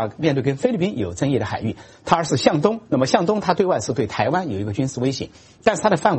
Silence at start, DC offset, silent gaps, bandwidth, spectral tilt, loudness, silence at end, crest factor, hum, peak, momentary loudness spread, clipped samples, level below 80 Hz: 0 s; under 0.1%; none; 8.8 kHz; -5.5 dB/octave; -21 LUFS; 0 s; 20 dB; none; 0 dBFS; 7 LU; under 0.1%; -52 dBFS